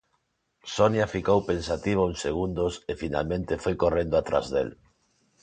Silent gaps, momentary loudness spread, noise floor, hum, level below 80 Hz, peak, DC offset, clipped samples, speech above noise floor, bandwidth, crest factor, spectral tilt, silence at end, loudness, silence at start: none; 7 LU; -74 dBFS; none; -46 dBFS; -6 dBFS; under 0.1%; under 0.1%; 48 dB; 9.4 kHz; 20 dB; -6 dB/octave; 0.7 s; -27 LUFS; 0.65 s